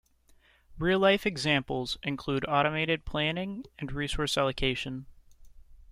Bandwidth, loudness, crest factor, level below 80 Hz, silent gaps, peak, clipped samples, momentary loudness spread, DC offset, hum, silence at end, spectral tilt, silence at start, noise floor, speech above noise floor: 15.5 kHz; -29 LUFS; 18 dB; -48 dBFS; none; -12 dBFS; under 0.1%; 12 LU; under 0.1%; none; 0 s; -5 dB/octave; 0.7 s; -62 dBFS; 33 dB